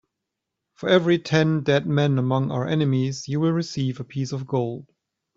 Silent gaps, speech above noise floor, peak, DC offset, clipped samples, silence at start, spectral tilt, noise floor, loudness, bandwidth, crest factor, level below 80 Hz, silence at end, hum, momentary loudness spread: none; 61 dB; -4 dBFS; under 0.1%; under 0.1%; 0.8 s; -6.5 dB/octave; -83 dBFS; -23 LUFS; 7.6 kHz; 20 dB; -60 dBFS; 0.55 s; none; 9 LU